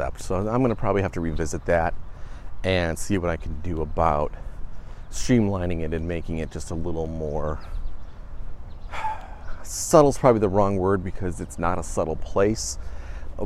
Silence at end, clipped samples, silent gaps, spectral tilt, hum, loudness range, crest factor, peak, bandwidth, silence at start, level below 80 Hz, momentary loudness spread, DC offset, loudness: 0 s; under 0.1%; none; -6 dB/octave; none; 9 LU; 22 dB; -2 dBFS; 13.5 kHz; 0 s; -34 dBFS; 22 LU; under 0.1%; -25 LUFS